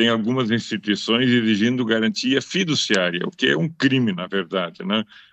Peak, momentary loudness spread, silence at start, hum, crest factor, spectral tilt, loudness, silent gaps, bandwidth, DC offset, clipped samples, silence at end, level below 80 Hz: -4 dBFS; 6 LU; 0 s; none; 16 dB; -4.5 dB/octave; -20 LUFS; none; 8.4 kHz; under 0.1%; under 0.1%; 0.3 s; -70 dBFS